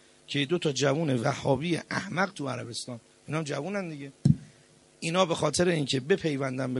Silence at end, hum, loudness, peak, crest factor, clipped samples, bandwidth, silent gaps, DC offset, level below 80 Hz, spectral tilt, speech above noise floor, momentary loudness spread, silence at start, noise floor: 0 s; none; -29 LUFS; -8 dBFS; 22 dB; under 0.1%; 11.5 kHz; none; under 0.1%; -58 dBFS; -5 dB/octave; 30 dB; 9 LU; 0.3 s; -59 dBFS